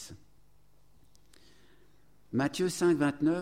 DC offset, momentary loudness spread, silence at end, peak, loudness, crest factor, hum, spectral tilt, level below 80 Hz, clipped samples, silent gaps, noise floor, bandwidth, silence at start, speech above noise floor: 0.1%; 9 LU; 0 s; -16 dBFS; -29 LUFS; 16 dB; 50 Hz at -70 dBFS; -5.5 dB/octave; -66 dBFS; under 0.1%; none; -66 dBFS; 16 kHz; 0 s; 38 dB